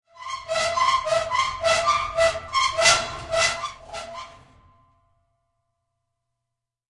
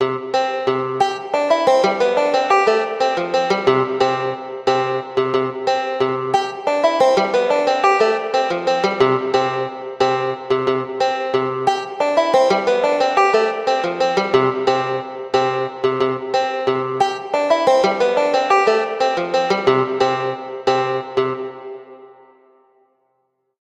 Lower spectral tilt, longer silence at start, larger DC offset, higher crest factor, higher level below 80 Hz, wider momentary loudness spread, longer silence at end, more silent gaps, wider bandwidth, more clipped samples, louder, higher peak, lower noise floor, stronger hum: second, -0.5 dB/octave vs -4.5 dB/octave; first, 0.15 s vs 0 s; neither; first, 22 dB vs 16 dB; first, -52 dBFS vs -60 dBFS; first, 17 LU vs 6 LU; first, 2.65 s vs 1.55 s; neither; about the same, 11.5 kHz vs 10.5 kHz; neither; second, -21 LUFS vs -18 LUFS; about the same, -4 dBFS vs -2 dBFS; first, -84 dBFS vs -68 dBFS; neither